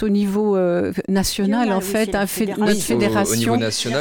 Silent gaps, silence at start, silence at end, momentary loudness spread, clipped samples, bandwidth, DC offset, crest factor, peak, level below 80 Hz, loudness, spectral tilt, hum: none; 0 s; 0 s; 3 LU; under 0.1%; 19 kHz; under 0.1%; 12 dB; -6 dBFS; -42 dBFS; -19 LUFS; -4.5 dB/octave; none